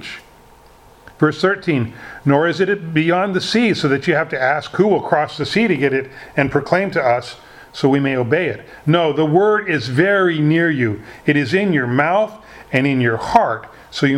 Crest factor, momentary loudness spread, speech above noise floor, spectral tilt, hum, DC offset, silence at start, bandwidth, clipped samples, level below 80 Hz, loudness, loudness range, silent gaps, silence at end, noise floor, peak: 18 dB; 7 LU; 29 dB; -6.5 dB/octave; none; under 0.1%; 0 s; 12.5 kHz; under 0.1%; -52 dBFS; -17 LUFS; 2 LU; none; 0 s; -46 dBFS; 0 dBFS